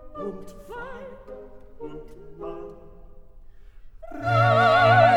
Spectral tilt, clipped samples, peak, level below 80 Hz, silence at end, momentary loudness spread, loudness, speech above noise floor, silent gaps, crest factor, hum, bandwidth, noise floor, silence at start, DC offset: -6.5 dB/octave; under 0.1%; -6 dBFS; -48 dBFS; 0 s; 26 LU; -19 LUFS; 6 dB; none; 18 dB; none; 10 kHz; -44 dBFS; 0.05 s; under 0.1%